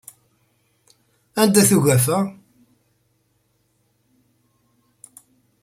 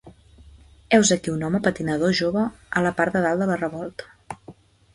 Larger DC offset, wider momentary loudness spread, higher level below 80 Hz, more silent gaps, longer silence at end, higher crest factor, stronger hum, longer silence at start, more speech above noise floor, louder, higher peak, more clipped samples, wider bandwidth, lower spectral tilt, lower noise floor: neither; second, 13 LU vs 22 LU; second, -60 dBFS vs -52 dBFS; neither; first, 3.3 s vs 0.4 s; about the same, 22 dB vs 20 dB; first, 50 Hz at -40 dBFS vs none; first, 1.35 s vs 0.05 s; first, 50 dB vs 27 dB; first, -17 LUFS vs -22 LUFS; about the same, -2 dBFS vs -2 dBFS; neither; first, 16 kHz vs 11.5 kHz; about the same, -4.5 dB/octave vs -4.5 dB/octave; first, -66 dBFS vs -49 dBFS